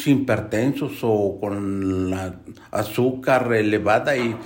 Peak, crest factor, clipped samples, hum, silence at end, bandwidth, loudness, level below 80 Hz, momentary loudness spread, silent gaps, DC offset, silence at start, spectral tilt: -6 dBFS; 16 dB; under 0.1%; none; 0 s; 16.5 kHz; -22 LUFS; -58 dBFS; 9 LU; none; under 0.1%; 0 s; -6.5 dB/octave